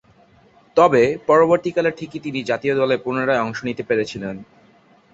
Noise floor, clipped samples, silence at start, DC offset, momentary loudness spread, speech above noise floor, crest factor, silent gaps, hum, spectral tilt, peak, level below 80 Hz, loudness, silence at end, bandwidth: -53 dBFS; under 0.1%; 0.75 s; under 0.1%; 13 LU; 34 dB; 18 dB; none; none; -6 dB/octave; -2 dBFS; -58 dBFS; -19 LUFS; 0.7 s; 8 kHz